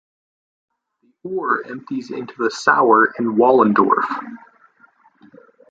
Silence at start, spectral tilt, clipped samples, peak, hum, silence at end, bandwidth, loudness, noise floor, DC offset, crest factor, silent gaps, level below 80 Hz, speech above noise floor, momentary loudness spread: 1.25 s; -5.5 dB/octave; under 0.1%; 0 dBFS; none; 1.35 s; 8.8 kHz; -17 LUFS; -64 dBFS; under 0.1%; 20 dB; none; -66 dBFS; 47 dB; 15 LU